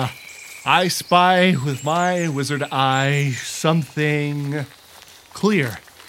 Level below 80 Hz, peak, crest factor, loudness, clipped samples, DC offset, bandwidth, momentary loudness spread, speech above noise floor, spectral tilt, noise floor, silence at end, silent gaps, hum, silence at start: -62 dBFS; -2 dBFS; 18 dB; -19 LUFS; under 0.1%; under 0.1%; 16.5 kHz; 12 LU; 26 dB; -5 dB/octave; -45 dBFS; 0.3 s; none; none; 0 s